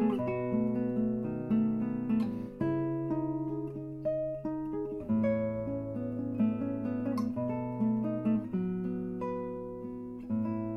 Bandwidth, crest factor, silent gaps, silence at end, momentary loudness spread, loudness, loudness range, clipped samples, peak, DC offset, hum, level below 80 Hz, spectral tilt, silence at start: 5.6 kHz; 14 dB; none; 0 s; 6 LU; -33 LUFS; 2 LU; under 0.1%; -18 dBFS; under 0.1%; none; -58 dBFS; -10.5 dB/octave; 0 s